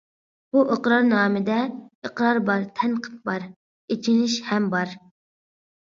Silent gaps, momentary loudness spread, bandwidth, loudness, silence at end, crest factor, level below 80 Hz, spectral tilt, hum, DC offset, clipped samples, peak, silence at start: 1.95-2.02 s, 3.56-3.88 s; 12 LU; 7.4 kHz; -23 LUFS; 0.95 s; 18 dB; -72 dBFS; -5.5 dB/octave; none; under 0.1%; under 0.1%; -6 dBFS; 0.55 s